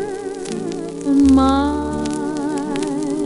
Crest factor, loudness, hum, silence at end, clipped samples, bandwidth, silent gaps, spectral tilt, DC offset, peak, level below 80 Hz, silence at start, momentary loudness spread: 14 dB; -19 LUFS; none; 0 s; under 0.1%; 11.5 kHz; none; -6 dB/octave; under 0.1%; -4 dBFS; -36 dBFS; 0 s; 13 LU